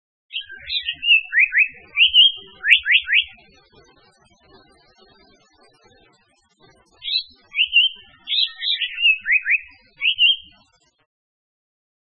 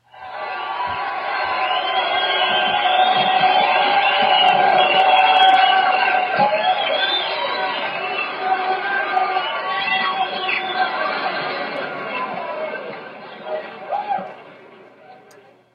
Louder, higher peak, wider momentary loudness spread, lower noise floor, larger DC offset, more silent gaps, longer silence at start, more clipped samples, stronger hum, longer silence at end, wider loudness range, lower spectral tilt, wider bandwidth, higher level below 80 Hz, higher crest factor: about the same, -16 LUFS vs -18 LUFS; about the same, 0 dBFS vs -2 dBFS; about the same, 15 LU vs 14 LU; first, -61 dBFS vs -48 dBFS; neither; neither; first, 0.35 s vs 0.15 s; neither; neither; first, 1.65 s vs 0.6 s; second, 9 LU vs 12 LU; second, 0.5 dB/octave vs -4 dB/octave; first, 9.8 kHz vs 5.4 kHz; first, -60 dBFS vs -68 dBFS; first, 22 dB vs 16 dB